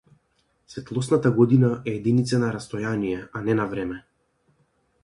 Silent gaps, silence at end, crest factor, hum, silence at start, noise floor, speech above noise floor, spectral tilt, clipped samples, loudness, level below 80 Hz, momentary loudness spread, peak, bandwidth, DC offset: none; 1.05 s; 20 dB; none; 0.7 s; -68 dBFS; 46 dB; -7.5 dB/octave; under 0.1%; -23 LUFS; -56 dBFS; 14 LU; -4 dBFS; 11.5 kHz; under 0.1%